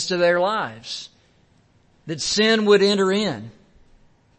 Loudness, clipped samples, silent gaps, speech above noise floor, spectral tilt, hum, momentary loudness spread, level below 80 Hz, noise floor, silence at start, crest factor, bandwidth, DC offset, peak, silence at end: -19 LUFS; under 0.1%; none; 39 dB; -4 dB/octave; none; 17 LU; -58 dBFS; -58 dBFS; 0 s; 18 dB; 8.8 kHz; under 0.1%; -4 dBFS; 0.9 s